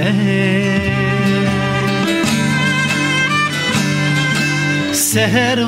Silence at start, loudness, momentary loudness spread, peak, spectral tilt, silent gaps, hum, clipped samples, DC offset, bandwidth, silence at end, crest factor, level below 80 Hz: 0 s; -15 LUFS; 3 LU; -2 dBFS; -4.5 dB/octave; none; none; under 0.1%; under 0.1%; 16 kHz; 0 s; 12 dB; -42 dBFS